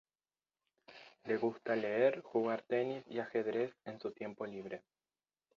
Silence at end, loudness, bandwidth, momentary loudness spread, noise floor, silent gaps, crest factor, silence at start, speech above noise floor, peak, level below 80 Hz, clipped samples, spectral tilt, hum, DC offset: 0.8 s; -38 LUFS; 7 kHz; 16 LU; under -90 dBFS; none; 20 dB; 0.9 s; over 53 dB; -18 dBFS; -84 dBFS; under 0.1%; -4.5 dB/octave; none; under 0.1%